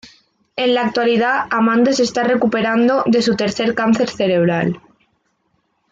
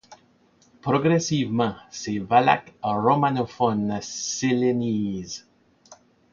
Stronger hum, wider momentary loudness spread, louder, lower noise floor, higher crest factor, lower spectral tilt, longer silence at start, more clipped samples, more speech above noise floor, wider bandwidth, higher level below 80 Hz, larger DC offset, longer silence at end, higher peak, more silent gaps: neither; second, 5 LU vs 11 LU; first, -16 LUFS vs -23 LUFS; first, -65 dBFS vs -60 dBFS; second, 12 dB vs 20 dB; about the same, -5.5 dB/octave vs -5 dB/octave; first, 0.55 s vs 0.1 s; neither; first, 50 dB vs 37 dB; about the same, 7.8 kHz vs 7.6 kHz; about the same, -58 dBFS vs -58 dBFS; neither; first, 1.15 s vs 0.4 s; about the same, -4 dBFS vs -4 dBFS; neither